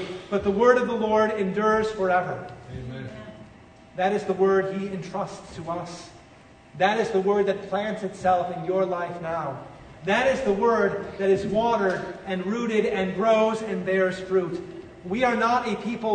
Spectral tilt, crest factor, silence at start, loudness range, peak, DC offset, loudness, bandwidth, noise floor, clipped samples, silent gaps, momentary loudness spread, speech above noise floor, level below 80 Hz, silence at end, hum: -6 dB/octave; 18 dB; 0 s; 4 LU; -6 dBFS; under 0.1%; -24 LUFS; 9.4 kHz; -50 dBFS; under 0.1%; none; 15 LU; 26 dB; -54 dBFS; 0 s; none